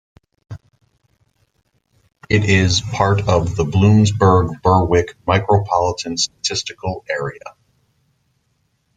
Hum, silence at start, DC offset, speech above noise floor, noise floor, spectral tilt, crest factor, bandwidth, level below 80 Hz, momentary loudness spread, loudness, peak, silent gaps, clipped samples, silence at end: none; 0.5 s; under 0.1%; 50 dB; -66 dBFS; -5.5 dB/octave; 16 dB; 9.2 kHz; -42 dBFS; 14 LU; -17 LUFS; -2 dBFS; none; under 0.1%; 1.45 s